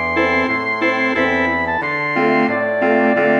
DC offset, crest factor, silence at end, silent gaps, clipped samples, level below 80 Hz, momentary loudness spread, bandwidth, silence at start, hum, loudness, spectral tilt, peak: under 0.1%; 14 dB; 0 s; none; under 0.1%; -46 dBFS; 3 LU; 8 kHz; 0 s; none; -16 LUFS; -6 dB/octave; -2 dBFS